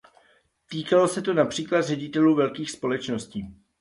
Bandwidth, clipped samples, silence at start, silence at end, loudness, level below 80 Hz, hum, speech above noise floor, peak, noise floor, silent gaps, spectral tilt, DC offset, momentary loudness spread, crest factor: 11.5 kHz; under 0.1%; 0.7 s; 0.25 s; -24 LUFS; -60 dBFS; none; 39 dB; -8 dBFS; -63 dBFS; none; -5.5 dB/octave; under 0.1%; 15 LU; 18 dB